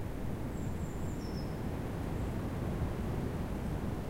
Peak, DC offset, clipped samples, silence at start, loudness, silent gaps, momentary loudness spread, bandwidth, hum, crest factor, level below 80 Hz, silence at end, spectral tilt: -24 dBFS; under 0.1%; under 0.1%; 0 s; -38 LUFS; none; 3 LU; 16 kHz; none; 12 dB; -42 dBFS; 0 s; -7.5 dB/octave